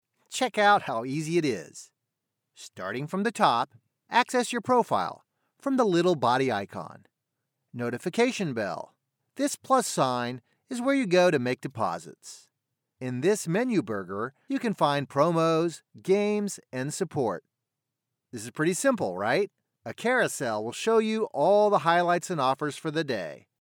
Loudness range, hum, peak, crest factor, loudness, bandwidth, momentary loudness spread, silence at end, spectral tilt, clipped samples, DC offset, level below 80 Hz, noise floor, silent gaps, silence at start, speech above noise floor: 5 LU; none; -8 dBFS; 20 dB; -27 LUFS; 18 kHz; 16 LU; 0.25 s; -5 dB/octave; under 0.1%; under 0.1%; -80 dBFS; -86 dBFS; none; 0.3 s; 59 dB